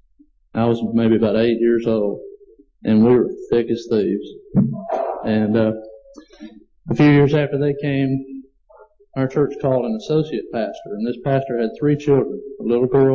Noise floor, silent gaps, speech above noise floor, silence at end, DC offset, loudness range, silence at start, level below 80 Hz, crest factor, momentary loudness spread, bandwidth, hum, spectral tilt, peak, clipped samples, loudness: -55 dBFS; none; 38 dB; 0 s; under 0.1%; 4 LU; 0.55 s; -52 dBFS; 12 dB; 11 LU; 7 kHz; none; -9 dB/octave; -6 dBFS; under 0.1%; -19 LUFS